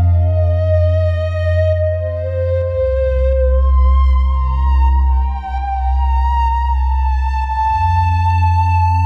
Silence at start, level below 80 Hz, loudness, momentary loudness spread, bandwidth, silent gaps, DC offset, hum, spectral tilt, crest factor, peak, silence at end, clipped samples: 0 s; -16 dBFS; -16 LUFS; 5 LU; 4.7 kHz; none; under 0.1%; none; -8.5 dB/octave; 8 dB; -4 dBFS; 0 s; under 0.1%